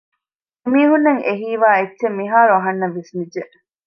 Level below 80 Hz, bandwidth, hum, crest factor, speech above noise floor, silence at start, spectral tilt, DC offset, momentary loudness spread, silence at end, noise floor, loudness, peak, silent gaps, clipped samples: -70 dBFS; 6.4 kHz; none; 16 dB; 68 dB; 0.65 s; -8 dB/octave; under 0.1%; 14 LU; 0.4 s; -84 dBFS; -16 LUFS; -2 dBFS; none; under 0.1%